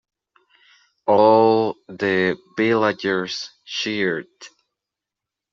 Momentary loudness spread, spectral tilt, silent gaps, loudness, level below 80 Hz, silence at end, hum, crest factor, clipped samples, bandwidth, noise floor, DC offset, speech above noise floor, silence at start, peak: 15 LU; -5 dB/octave; none; -20 LUFS; -68 dBFS; 1.05 s; none; 18 dB; under 0.1%; 7.6 kHz; -86 dBFS; under 0.1%; 67 dB; 1.05 s; -2 dBFS